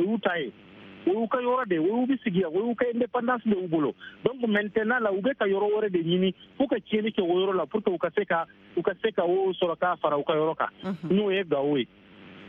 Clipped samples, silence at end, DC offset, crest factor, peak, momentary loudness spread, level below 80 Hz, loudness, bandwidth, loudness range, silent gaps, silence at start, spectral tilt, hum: under 0.1%; 0 s; under 0.1%; 18 dB; -8 dBFS; 5 LU; -68 dBFS; -27 LUFS; 4.2 kHz; 1 LU; none; 0 s; -9 dB/octave; none